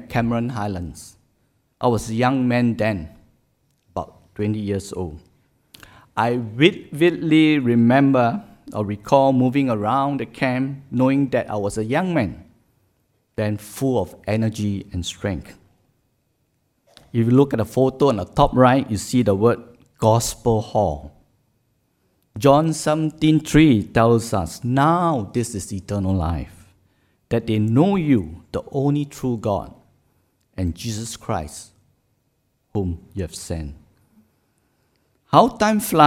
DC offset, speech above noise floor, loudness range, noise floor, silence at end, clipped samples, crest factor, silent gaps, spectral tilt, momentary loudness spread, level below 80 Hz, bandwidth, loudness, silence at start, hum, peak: under 0.1%; 49 dB; 11 LU; -68 dBFS; 0 s; under 0.1%; 20 dB; none; -6.5 dB/octave; 15 LU; -44 dBFS; 16.5 kHz; -20 LUFS; 0 s; none; 0 dBFS